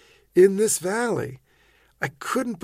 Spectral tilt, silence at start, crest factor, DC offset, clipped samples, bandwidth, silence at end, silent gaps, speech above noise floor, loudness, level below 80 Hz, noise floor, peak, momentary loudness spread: -4.5 dB/octave; 0.35 s; 18 dB; under 0.1%; under 0.1%; 16 kHz; 0.05 s; none; 38 dB; -23 LUFS; -62 dBFS; -60 dBFS; -6 dBFS; 14 LU